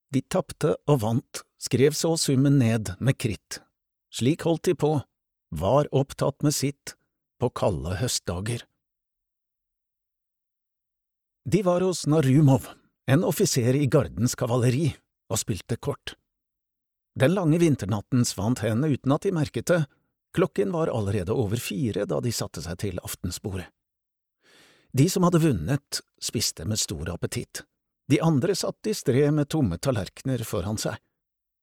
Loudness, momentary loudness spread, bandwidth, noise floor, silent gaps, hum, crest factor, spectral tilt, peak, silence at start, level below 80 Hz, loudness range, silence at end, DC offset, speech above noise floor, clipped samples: -25 LUFS; 11 LU; 17 kHz; -84 dBFS; none; none; 18 dB; -5.5 dB/octave; -8 dBFS; 0.1 s; -52 dBFS; 7 LU; 0.65 s; under 0.1%; 60 dB; under 0.1%